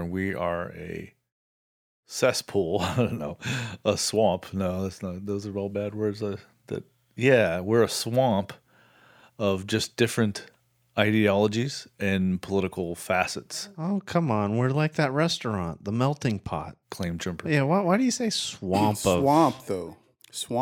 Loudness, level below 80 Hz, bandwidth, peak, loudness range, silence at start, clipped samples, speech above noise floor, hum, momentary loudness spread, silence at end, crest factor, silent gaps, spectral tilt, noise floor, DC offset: -26 LUFS; -62 dBFS; 19.5 kHz; -4 dBFS; 4 LU; 0 s; under 0.1%; 32 dB; none; 13 LU; 0 s; 22 dB; 1.32-2.03 s; -5 dB/octave; -58 dBFS; under 0.1%